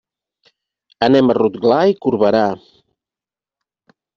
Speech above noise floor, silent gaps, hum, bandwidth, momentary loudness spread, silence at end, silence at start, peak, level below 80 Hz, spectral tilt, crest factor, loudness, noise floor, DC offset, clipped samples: 76 dB; none; none; 7 kHz; 7 LU; 1.6 s; 1 s; 0 dBFS; -58 dBFS; -5 dB/octave; 18 dB; -15 LUFS; -90 dBFS; under 0.1%; under 0.1%